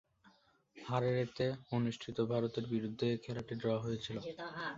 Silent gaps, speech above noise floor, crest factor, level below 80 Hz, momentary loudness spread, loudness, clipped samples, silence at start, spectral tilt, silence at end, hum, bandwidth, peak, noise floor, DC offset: none; 31 dB; 18 dB; -68 dBFS; 7 LU; -38 LUFS; under 0.1%; 0.25 s; -6 dB/octave; 0 s; none; 7.6 kHz; -22 dBFS; -69 dBFS; under 0.1%